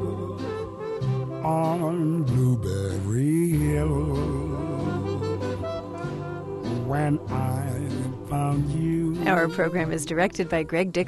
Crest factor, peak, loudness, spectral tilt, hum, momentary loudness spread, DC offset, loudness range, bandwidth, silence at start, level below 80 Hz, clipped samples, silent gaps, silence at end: 16 dB; -8 dBFS; -26 LUFS; -7 dB/octave; none; 9 LU; under 0.1%; 4 LU; 12.5 kHz; 0 s; -42 dBFS; under 0.1%; none; 0 s